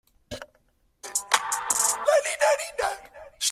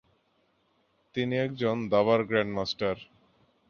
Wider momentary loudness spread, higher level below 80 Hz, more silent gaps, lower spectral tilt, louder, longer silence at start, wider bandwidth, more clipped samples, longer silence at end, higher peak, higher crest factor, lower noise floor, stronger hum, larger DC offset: first, 19 LU vs 9 LU; about the same, -62 dBFS vs -62 dBFS; neither; second, 1 dB/octave vs -6.5 dB/octave; first, -24 LUFS vs -28 LUFS; second, 0.3 s vs 1.15 s; first, 16 kHz vs 7 kHz; neither; second, 0 s vs 0.65 s; first, -4 dBFS vs -10 dBFS; about the same, 24 dB vs 20 dB; second, -66 dBFS vs -71 dBFS; neither; neither